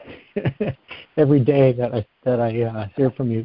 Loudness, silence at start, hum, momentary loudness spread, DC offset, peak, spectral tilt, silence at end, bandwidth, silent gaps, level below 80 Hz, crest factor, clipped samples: -21 LUFS; 0 s; none; 12 LU; under 0.1%; -4 dBFS; -13 dB/octave; 0 s; 5.2 kHz; none; -50 dBFS; 16 dB; under 0.1%